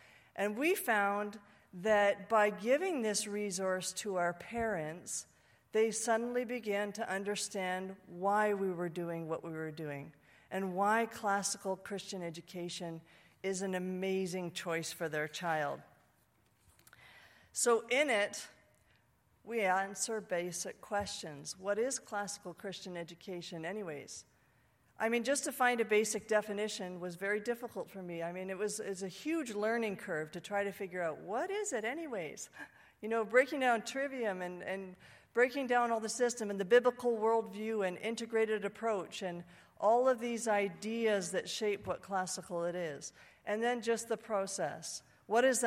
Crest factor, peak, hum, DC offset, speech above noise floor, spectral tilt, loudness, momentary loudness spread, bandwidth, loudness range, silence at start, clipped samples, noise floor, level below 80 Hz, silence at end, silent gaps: 22 dB; -14 dBFS; none; under 0.1%; 37 dB; -3.5 dB/octave; -35 LUFS; 13 LU; 16 kHz; 6 LU; 0.35 s; under 0.1%; -72 dBFS; -76 dBFS; 0 s; none